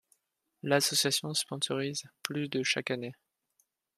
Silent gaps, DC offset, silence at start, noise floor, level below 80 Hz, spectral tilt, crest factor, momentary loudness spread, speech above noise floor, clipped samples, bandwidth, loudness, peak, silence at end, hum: none; under 0.1%; 0.65 s; -80 dBFS; -78 dBFS; -2.5 dB/octave; 28 dB; 11 LU; 48 dB; under 0.1%; 15 kHz; -30 LUFS; -6 dBFS; 0.85 s; none